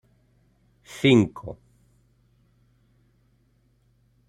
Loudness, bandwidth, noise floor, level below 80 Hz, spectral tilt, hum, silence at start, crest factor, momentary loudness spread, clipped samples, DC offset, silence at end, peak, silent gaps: -21 LUFS; 13.5 kHz; -64 dBFS; -60 dBFS; -6.5 dB/octave; none; 0.95 s; 22 dB; 25 LU; under 0.1%; under 0.1%; 2.75 s; -6 dBFS; none